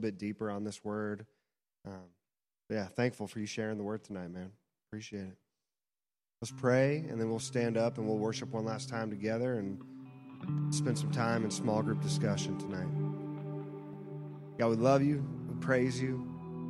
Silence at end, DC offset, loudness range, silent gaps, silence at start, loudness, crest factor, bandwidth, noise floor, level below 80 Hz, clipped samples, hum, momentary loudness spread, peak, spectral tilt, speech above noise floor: 0 s; under 0.1%; 7 LU; none; 0 s; -35 LUFS; 20 dB; 12 kHz; under -90 dBFS; -70 dBFS; under 0.1%; none; 16 LU; -14 dBFS; -6 dB/octave; over 56 dB